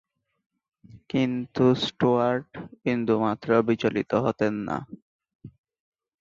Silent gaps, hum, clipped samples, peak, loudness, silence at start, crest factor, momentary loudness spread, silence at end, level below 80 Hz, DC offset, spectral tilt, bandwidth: 5.02-5.19 s, 5.35-5.39 s; none; under 0.1%; -6 dBFS; -25 LUFS; 0.95 s; 20 dB; 10 LU; 0.7 s; -62 dBFS; under 0.1%; -7 dB/octave; 7.4 kHz